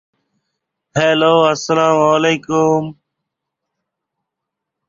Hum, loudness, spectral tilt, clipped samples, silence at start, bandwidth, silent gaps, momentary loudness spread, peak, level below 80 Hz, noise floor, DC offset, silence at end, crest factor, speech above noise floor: none; -14 LUFS; -5 dB/octave; under 0.1%; 0.95 s; 7.6 kHz; none; 7 LU; -2 dBFS; -60 dBFS; -80 dBFS; under 0.1%; 1.95 s; 16 dB; 67 dB